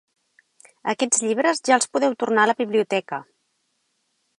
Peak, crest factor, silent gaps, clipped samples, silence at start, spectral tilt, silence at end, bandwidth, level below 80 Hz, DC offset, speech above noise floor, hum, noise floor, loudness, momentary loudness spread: -2 dBFS; 20 dB; none; under 0.1%; 0.85 s; -2.5 dB/octave; 1.15 s; 11.5 kHz; -80 dBFS; under 0.1%; 50 dB; none; -71 dBFS; -21 LUFS; 11 LU